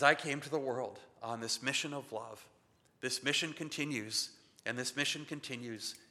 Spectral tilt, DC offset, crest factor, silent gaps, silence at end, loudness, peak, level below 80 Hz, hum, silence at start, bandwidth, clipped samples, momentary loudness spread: -2.5 dB/octave; under 0.1%; 28 dB; none; 0.1 s; -37 LUFS; -10 dBFS; -84 dBFS; none; 0 s; 15 kHz; under 0.1%; 12 LU